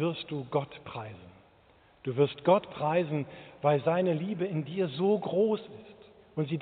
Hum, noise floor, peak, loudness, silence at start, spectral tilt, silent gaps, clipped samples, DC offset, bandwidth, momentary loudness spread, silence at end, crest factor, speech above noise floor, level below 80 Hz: none; -61 dBFS; -10 dBFS; -30 LUFS; 0 s; -6 dB/octave; none; under 0.1%; under 0.1%; 4.6 kHz; 15 LU; 0 s; 20 dB; 32 dB; -70 dBFS